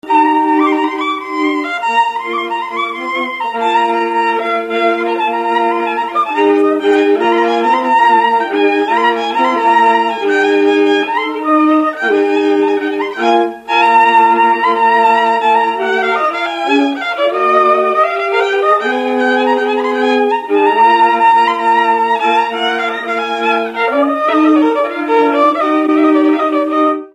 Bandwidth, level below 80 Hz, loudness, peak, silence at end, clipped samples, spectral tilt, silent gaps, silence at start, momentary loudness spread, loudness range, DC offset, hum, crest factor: 10.5 kHz; -64 dBFS; -12 LUFS; 0 dBFS; 0.05 s; under 0.1%; -3.5 dB/octave; none; 0.05 s; 6 LU; 4 LU; under 0.1%; none; 12 dB